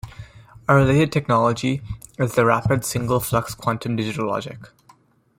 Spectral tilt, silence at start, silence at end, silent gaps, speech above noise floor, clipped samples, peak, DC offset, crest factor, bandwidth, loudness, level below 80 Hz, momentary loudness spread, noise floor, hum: -6 dB/octave; 0.05 s; 0.75 s; none; 35 dB; under 0.1%; -2 dBFS; under 0.1%; 20 dB; 16.5 kHz; -21 LUFS; -46 dBFS; 12 LU; -55 dBFS; none